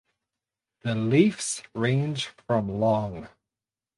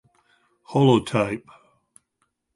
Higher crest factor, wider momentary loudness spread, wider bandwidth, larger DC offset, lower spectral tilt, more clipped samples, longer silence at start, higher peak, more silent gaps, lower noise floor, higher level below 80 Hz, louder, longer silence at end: about the same, 20 dB vs 20 dB; about the same, 12 LU vs 10 LU; about the same, 11.5 kHz vs 11.5 kHz; neither; second, -5.5 dB/octave vs -7 dB/octave; neither; first, 0.85 s vs 0.7 s; about the same, -6 dBFS vs -4 dBFS; neither; first, under -90 dBFS vs -74 dBFS; about the same, -58 dBFS vs -60 dBFS; second, -26 LUFS vs -21 LUFS; second, 0.7 s vs 1.15 s